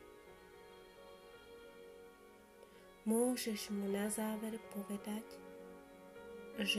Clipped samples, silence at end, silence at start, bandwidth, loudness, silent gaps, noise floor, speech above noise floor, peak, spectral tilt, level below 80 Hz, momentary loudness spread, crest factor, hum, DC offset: under 0.1%; 0 s; 0 s; 15 kHz; -41 LUFS; none; -61 dBFS; 22 dB; -22 dBFS; -3.5 dB/octave; -74 dBFS; 22 LU; 22 dB; none; under 0.1%